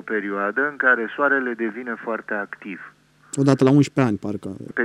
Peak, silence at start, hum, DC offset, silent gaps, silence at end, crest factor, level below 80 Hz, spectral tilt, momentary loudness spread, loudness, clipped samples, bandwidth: -2 dBFS; 0.05 s; none; under 0.1%; none; 0 s; 20 dB; -68 dBFS; -6.5 dB/octave; 15 LU; -21 LUFS; under 0.1%; 11 kHz